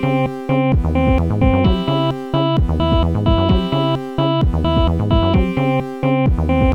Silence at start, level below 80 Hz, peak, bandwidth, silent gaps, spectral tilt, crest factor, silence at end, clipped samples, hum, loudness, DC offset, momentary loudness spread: 0 s; -22 dBFS; -2 dBFS; 7.6 kHz; none; -8.5 dB/octave; 12 dB; 0 s; under 0.1%; none; -17 LUFS; 0.5%; 4 LU